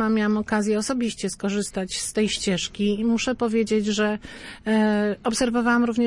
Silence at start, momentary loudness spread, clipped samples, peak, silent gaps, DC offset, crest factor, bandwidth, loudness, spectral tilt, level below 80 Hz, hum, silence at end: 0 s; 6 LU; under 0.1%; -10 dBFS; none; under 0.1%; 14 dB; 11.5 kHz; -23 LUFS; -4.5 dB/octave; -50 dBFS; none; 0 s